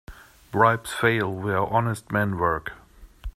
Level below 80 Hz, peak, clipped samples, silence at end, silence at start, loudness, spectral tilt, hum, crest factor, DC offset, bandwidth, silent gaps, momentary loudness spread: -46 dBFS; -4 dBFS; under 0.1%; 0.05 s; 0.1 s; -24 LUFS; -6 dB/octave; none; 22 dB; under 0.1%; 15 kHz; none; 10 LU